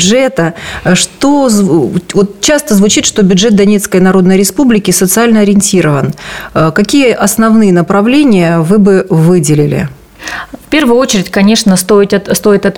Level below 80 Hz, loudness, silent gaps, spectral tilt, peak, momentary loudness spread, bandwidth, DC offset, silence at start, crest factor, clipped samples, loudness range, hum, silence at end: -36 dBFS; -8 LUFS; none; -5 dB/octave; 0 dBFS; 7 LU; 17 kHz; under 0.1%; 0 s; 8 dB; under 0.1%; 2 LU; none; 0 s